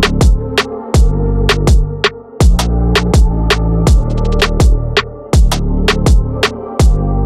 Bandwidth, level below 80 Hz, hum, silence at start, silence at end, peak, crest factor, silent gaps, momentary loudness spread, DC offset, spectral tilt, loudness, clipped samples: 13.5 kHz; -12 dBFS; none; 0 s; 0 s; -2 dBFS; 8 dB; none; 4 LU; under 0.1%; -5.5 dB/octave; -13 LUFS; under 0.1%